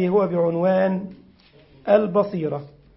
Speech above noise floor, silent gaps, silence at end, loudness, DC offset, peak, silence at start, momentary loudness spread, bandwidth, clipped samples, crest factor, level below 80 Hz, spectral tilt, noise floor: 32 dB; none; 0.3 s; -21 LUFS; under 0.1%; -4 dBFS; 0 s; 14 LU; 5.8 kHz; under 0.1%; 18 dB; -60 dBFS; -12.5 dB/octave; -52 dBFS